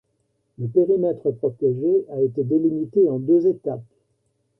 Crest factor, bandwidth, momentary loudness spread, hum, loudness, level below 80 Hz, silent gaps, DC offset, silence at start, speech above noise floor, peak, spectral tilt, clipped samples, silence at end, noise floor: 14 dB; 1.7 kHz; 8 LU; none; -21 LUFS; -64 dBFS; none; under 0.1%; 0.6 s; 50 dB; -6 dBFS; -13 dB/octave; under 0.1%; 0.75 s; -70 dBFS